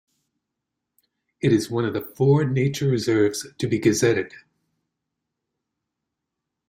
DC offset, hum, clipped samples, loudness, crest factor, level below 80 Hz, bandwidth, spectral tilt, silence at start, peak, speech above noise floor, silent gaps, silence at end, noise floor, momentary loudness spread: under 0.1%; none; under 0.1%; -22 LUFS; 18 dB; -60 dBFS; 16 kHz; -6 dB/octave; 1.45 s; -6 dBFS; 62 dB; none; 2.4 s; -83 dBFS; 7 LU